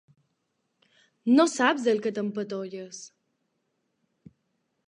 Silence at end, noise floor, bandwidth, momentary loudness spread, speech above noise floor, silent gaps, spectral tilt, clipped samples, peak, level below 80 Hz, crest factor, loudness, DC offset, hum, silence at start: 1.8 s; -77 dBFS; 10.5 kHz; 18 LU; 52 dB; none; -4 dB/octave; under 0.1%; -8 dBFS; -82 dBFS; 20 dB; -25 LUFS; under 0.1%; none; 1.25 s